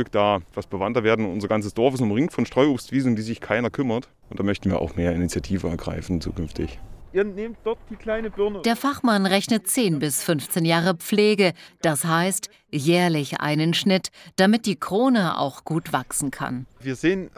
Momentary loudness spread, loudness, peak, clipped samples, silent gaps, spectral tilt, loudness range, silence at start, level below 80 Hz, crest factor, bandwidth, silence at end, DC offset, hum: 10 LU; -23 LUFS; -4 dBFS; under 0.1%; none; -5 dB/octave; 6 LU; 0 s; -44 dBFS; 18 dB; 16 kHz; 0.1 s; under 0.1%; none